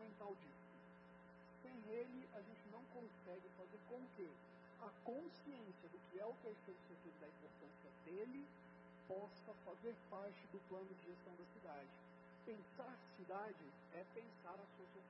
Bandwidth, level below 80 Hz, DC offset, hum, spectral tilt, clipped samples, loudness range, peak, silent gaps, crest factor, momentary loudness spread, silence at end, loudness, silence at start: 5.6 kHz; -90 dBFS; under 0.1%; none; -5.5 dB/octave; under 0.1%; 2 LU; -38 dBFS; none; 18 dB; 11 LU; 0 s; -57 LUFS; 0 s